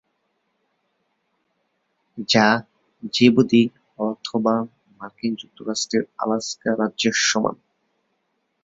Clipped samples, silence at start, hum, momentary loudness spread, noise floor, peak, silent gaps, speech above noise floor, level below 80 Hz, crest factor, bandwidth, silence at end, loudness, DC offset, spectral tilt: under 0.1%; 2.15 s; none; 16 LU; -72 dBFS; -2 dBFS; none; 52 dB; -64 dBFS; 22 dB; 7.8 kHz; 1.1 s; -21 LUFS; under 0.1%; -4 dB/octave